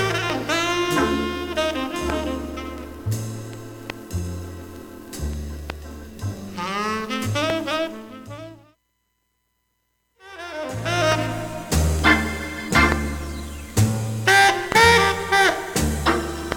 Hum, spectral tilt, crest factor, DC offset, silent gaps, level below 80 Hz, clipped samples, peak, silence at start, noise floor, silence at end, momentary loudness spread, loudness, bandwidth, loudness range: none; -4 dB/octave; 20 dB; under 0.1%; none; -36 dBFS; under 0.1%; -2 dBFS; 0 s; -72 dBFS; 0 s; 19 LU; -21 LUFS; 17.5 kHz; 14 LU